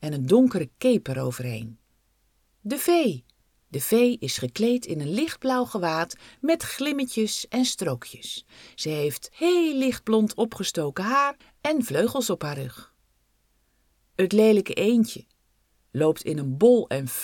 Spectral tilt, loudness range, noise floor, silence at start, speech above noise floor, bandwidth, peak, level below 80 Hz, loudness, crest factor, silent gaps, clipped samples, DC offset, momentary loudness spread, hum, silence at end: -5 dB/octave; 3 LU; -68 dBFS; 0 s; 44 dB; 19 kHz; -6 dBFS; -62 dBFS; -24 LUFS; 20 dB; none; under 0.1%; under 0.1%; 15 LU; none; 0 s